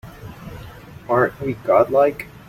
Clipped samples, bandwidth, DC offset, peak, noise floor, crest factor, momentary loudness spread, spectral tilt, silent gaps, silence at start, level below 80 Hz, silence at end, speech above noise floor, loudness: under 0.1%; 16 kHz; under 0.1%; -2 dBFS; -38 dBFS; 18 dB; 22 LU; -7.5 dB/octave; none; 0.05 s; -48 dBFS; 0.2 s; 21 dB; -18 LUFS